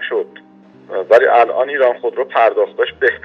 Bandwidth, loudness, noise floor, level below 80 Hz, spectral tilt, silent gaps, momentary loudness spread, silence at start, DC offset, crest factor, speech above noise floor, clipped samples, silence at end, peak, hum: 7 kHz; -14 LUFS; -44 dBFS; -60 dBFS; -4.5 dB/octave; none; 13 LU; 0 s; under 0.1%; 14 dB; 30 dB; under 0.1%; 0.05 s; 0 dBFS; none